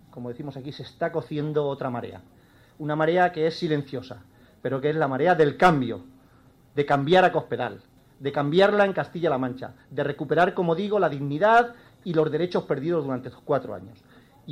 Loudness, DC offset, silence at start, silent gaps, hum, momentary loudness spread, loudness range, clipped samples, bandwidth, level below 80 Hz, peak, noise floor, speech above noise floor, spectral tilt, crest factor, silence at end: -24 LUFS; under 0.1%; 0.15 s; none; none; 17 LU; 4 LU; under 0.1%; 12.5 kHz; -60 dBFS; -4 dBFS; -56 dBFS; 32 dB; -7 dB/octave; 20 dB; 0 s